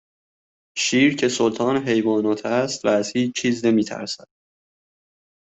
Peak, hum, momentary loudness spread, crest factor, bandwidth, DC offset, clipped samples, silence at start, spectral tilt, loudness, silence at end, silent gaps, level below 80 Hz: -6 dBFS; none; 10 LU; 16 dB; 8.4 kHz; under 0.1%; under 0.1%; 0.75 s; -4 dB/octave; -21 LUFS; 1.45 s; none; -64 dBFS